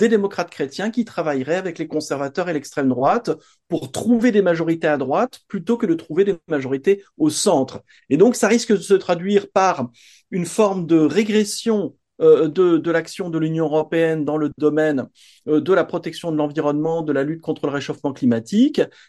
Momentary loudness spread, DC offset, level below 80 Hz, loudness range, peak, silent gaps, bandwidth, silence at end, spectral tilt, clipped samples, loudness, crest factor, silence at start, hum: 10 LU; under 0.1%; -64 dBFS; 4 LU; -2 dBFS; none; 12.5 kHz; 0.2 s; -5.5 dB/octave; under 0.1%; -20 LUFS; 16 dB; 0 s; none